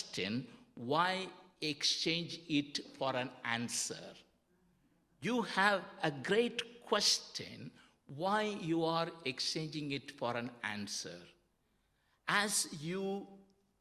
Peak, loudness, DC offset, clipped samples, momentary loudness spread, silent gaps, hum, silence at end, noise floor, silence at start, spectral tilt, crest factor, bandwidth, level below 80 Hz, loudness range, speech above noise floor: -14 dBFS; -36 LUFS; under 0.1%; under 0.1%; 15 LU; none; none; 0.4 s; -77 dBFS; 0 s; -3 dB/octave; 24 dB; 15 kHz; -78 dBFS; 4 LU; 40 dB